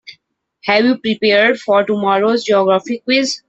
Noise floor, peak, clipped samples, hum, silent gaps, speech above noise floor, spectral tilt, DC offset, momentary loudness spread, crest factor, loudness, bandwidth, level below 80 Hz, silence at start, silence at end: -58 dBFS; 0 dBFS; under 0.1%; none; none; 44 dB; -4 dB/octave; under 0.1%; 4 LU; 14 dB; -14 LUFS; 8.2 kHz; -62 dBFS; 0.1 s; 0.1 s